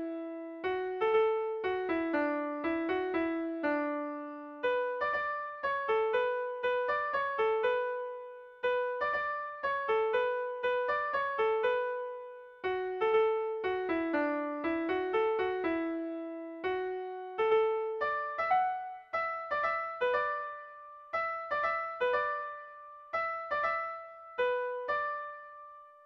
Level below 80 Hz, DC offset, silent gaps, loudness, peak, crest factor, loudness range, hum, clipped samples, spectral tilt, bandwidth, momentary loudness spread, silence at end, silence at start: -70 dBFS; under 0.1%; none; -33 LUFS; -18 dBFS; 16 dB; 2 LU; none; under 0.1%; -6 dB/octave; 6 kHz; 11 LU; 0.05 s; 0 s